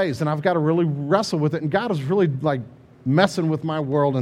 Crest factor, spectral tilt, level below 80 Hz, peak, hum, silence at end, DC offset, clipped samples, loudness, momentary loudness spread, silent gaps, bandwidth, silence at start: 20 dB; -7 dB/octave; -60 dBFS; 0 dBFS; none; 0 s; under 0.1%; under 0.1%; -22 LUFS; 5 LU; none; 12.5 kHz; 0 s